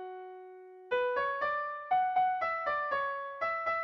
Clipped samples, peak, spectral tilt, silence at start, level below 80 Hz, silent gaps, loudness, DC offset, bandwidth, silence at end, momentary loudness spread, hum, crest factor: under 0.1%; -20 dBFS; -4.5 dB/octave; 0 s; -70 dBFS; none; -32 LUFS; under 0.1%; 6 kHz; 0 s; 18 LU; none; 14 dB